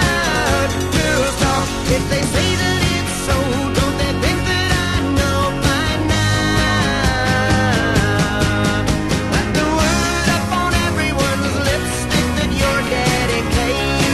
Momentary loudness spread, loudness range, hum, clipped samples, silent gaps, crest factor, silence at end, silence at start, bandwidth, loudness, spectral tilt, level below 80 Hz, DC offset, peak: 3 LU; 1 LU; none; under 0.1%; none; 14 dB; 0 s; 0 s; 13.5 kHz; -17 LUFS; -4.5 dB/octave; -26 dBFS; 0.5%; -2 dBFS